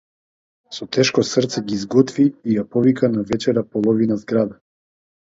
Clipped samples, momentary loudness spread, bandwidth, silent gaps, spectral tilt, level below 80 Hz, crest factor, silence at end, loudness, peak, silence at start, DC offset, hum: under 0.1%; 7 LU; 7.8 kHz; none; -5.5 dB/octave; -56 dBFS; 18 dB; 0.7 s; -19 LUFS; -2 dBFS; 0.7 s; under 0.1%; none